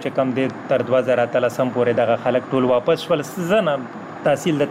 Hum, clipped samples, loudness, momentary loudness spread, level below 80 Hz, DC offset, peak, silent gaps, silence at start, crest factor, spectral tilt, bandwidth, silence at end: none; under 0.1%; -20 LUFS; 5 LU; -60 dBFS; under 0.1%; -8 dBFS; none; 0 s; 12 dB; -6 dB/octave; 16 kHz; 0 s